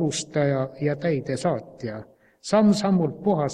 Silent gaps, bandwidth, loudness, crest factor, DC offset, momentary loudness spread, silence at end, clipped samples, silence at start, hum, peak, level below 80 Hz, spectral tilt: none; 11.5 kHz; -23 LUFS; 18 dB; under 0.1%; 15 LU; 0 s; under 0.1%; 0 s; none; -6 dBFS; -60 dBFS; -6 dB/octave